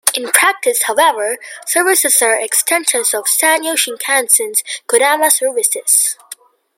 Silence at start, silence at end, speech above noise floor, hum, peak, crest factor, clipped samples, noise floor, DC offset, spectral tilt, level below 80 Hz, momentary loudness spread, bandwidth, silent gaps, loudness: 0.05 s; 0.45 s; 24 dB; none; 0 dBFS; 14 dB; under 0.1%; -38 dBFS; under 0.1%; 2 dB/octave; -70 dBFS; 6 LU; over 20 kHz; none; -12 LUFS